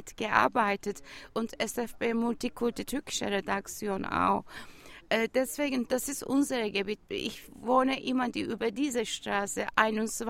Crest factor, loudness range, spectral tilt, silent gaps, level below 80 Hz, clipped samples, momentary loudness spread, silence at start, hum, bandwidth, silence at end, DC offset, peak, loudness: 24 dB; 2 LU; -3.5 dB/octave; none; -58 dBFS; under 0.1%; 9 LU; 0 s; none; 16 kHz; 0 s; under 0.1%; -6 dBFS; -30 LUFS